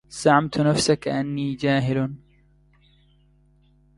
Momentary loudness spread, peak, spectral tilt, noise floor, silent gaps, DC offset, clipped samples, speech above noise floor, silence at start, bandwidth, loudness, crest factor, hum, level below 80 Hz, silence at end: 8 LU; -4 dBFS; -5.5 dB/octave; -58 dBFS; none; under 0.1%; under 0.1%; 37 dB; 0.1 s; 11.5 kHz; -22 LUFS; 20 dB; none; -54 dBFS; 1.8 s